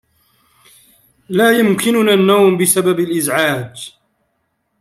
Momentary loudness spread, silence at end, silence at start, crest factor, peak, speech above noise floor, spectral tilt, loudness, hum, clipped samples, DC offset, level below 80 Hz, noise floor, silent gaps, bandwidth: 13 LU; 0.9 s; 1.3 s; 16 dB; 0 dBFS; 54 dB; -4 dB/octave; -13 LUFS; none; under 0.1%; under 0.1%; -60 dBFS; -67 dBFS; none; 16 kHz